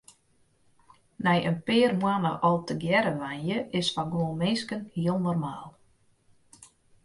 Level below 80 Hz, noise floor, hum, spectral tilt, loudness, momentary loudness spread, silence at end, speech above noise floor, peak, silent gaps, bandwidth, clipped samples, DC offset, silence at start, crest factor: -64 dBFS; -66 dBFS; none; -6 dB/octave; -27 LUFS; 7 LU; 0.4 s; 39 dB; -10 dBFS; none; 11.5 kHz; under 0.1%; under 0.1%; 1.2 s; 18 dB